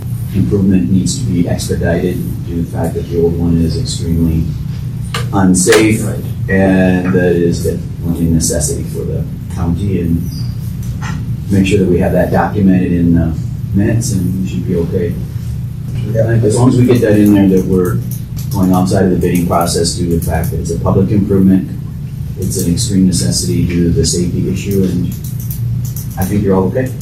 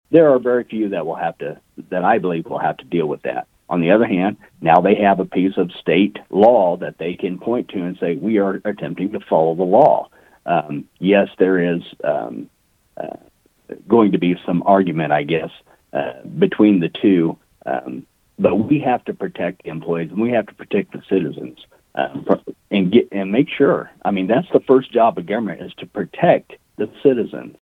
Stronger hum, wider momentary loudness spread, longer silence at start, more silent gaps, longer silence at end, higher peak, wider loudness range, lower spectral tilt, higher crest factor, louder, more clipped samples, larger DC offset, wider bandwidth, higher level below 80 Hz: neither; second, 10 LU vs 14 LU; about the same, 0 s vs 0.1 s; neither; second, 0 s vs 0.15 s; about the same, 0 dBFS vs 0 dBFS; about the same, 4 LU vs 4 LU; second, -6 dB/octave vs -9 dB/octave; second, 12 dB vs 18 dB; first, -13 LUFS vs -18 LUFS; neither; neither; first, 16 kHz vs 4.5 kHz; first, -28 dBFS vs -60 dBFS